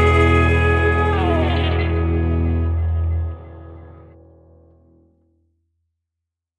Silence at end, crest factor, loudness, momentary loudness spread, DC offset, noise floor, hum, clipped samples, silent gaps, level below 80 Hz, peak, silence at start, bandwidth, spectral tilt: 2.6 s; 16 dB; -18 LUFS; 17 LU; under 0.1%; -83 dBFS; none; under 0.1%; none; -26 dBFS; -4 dBFS; 0 s; 8.2 kHz; -7.5 dB/octave